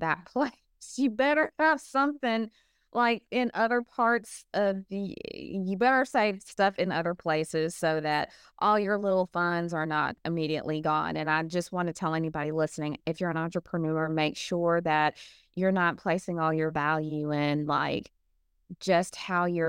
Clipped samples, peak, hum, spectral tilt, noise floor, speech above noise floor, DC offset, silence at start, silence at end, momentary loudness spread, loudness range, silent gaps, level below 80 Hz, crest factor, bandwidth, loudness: under 0.1%; -12 dBFS; none; -5.5 dB/octave; -73 dBFS; 44 dB; under 0.1%; 0 s; 0 s; 8 LU; 2 LU; none; -66 dBFS; 16 dB; 16.5 kHz; -28 LUFS